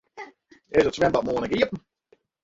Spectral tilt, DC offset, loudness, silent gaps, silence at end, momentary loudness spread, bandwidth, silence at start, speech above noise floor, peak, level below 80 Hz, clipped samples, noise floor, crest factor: -5.5 dB/octave; under 0.1%; -24 LUFS; none; 0.65 s; 21 LU; 8 kHz; 0.15 s; 41 dB; -6 dBFS; -52 dBFS; under 0.1%; -64 dBFS; 18 dB